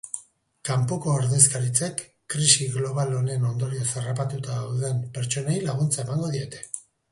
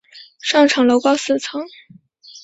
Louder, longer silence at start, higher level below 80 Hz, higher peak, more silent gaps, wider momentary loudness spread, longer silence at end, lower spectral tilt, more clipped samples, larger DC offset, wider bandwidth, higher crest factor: second, -24 LUFS vs -16 LUFS; about the same, 0.05 s vs 0.15 s; about the same, -60 dBFS vs -64 dBFS; about the same, -2 dBFS vs -2 dBFS; neither; about the same, 16 LU vs 15 LU; first, 0.3 s vs 0.05 s; first, -4 dB/octave vs -2.5 dB/octave; neither; neither; first, 11.5 kHz vs 8 kHz; first, 24 dB vs 16 dB